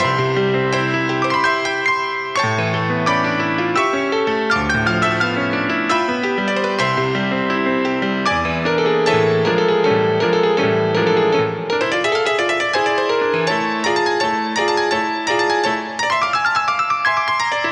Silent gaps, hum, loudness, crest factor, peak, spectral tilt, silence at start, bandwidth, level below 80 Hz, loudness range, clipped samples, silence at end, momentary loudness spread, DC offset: none; none; -17 LUFS; 14 dB; -4 dBFS; -5 dB/octave; 0 s; 11 kHz; -48 dBFS; 2 LU; under 0.1%; 0 s; 3 LU; under 0.1%